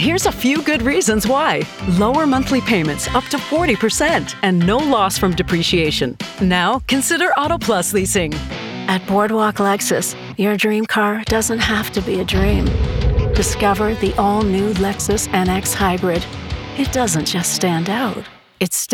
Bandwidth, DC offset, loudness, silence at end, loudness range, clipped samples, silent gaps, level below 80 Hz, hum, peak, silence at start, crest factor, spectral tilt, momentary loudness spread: 18.5 kHz; under 0.1%; -17 LUFS; 0 s; 2 LU; under 0.1%; none; -30 dBFS; none; 0 dBFS; 0 s; 16 dB; -4 dB/octave; 5 LU